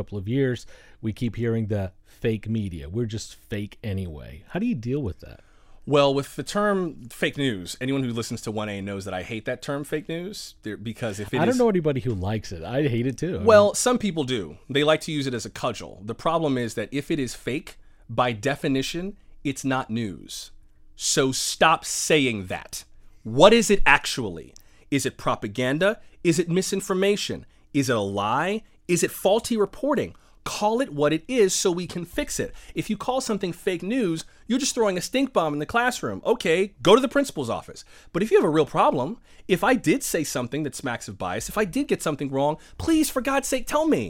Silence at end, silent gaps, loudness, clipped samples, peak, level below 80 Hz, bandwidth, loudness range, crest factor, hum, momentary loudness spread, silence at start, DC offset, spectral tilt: 0 s; none; -24 LUFS; under 0.1%; 0 dBFS; -46 dBFS; 17 kHz; 7 LU; 24 dB; none; 13 LU; 0 s; under 0.1%; -4.5 dB/octave